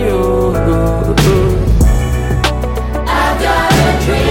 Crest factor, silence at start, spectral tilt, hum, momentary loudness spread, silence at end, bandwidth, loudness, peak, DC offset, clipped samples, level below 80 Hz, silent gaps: 12 dB; 0 s; -6 dB/octave; none; 5 LU; 0 s; 17 kHz; -13 LUFS; 0 dBFS; under 0.1%; under 0.1%; -16 dBFS; none